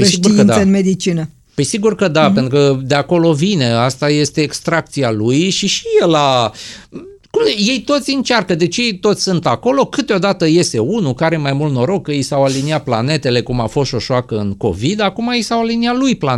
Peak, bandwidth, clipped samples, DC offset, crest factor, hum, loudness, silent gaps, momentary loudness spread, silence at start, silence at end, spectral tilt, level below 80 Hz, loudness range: 0 dBFS; 13 kHz; under 0.1%; under 0.1%; 14 dB; none; -14 LUFS; none; 6 LU; 0 s; 0 s; -5 dB/octave; -44 dBFS; 3 LU